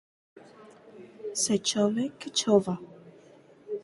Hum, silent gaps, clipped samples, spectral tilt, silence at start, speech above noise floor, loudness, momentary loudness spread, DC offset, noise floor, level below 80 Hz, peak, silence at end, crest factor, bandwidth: none; none; under 0.1%; -4 dB/octave; 0.35 s; 29 dB; -27 LUFS; 16 LU; under 0.1%; -55 dBFS; -70 dBFS; -10 dBFS; 0 s; 20 dB; 11.5 kHz